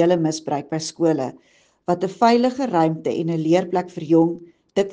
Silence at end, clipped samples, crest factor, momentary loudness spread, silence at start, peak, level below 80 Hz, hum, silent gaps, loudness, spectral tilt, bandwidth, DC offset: 0 s; under 0.1%; 18 dB; 9 LU; 0 s; -2 dBFS; -66 dBFS; none; none; -21 LUFS; -6 dB/octave; 9.6 kHz; under 0.1%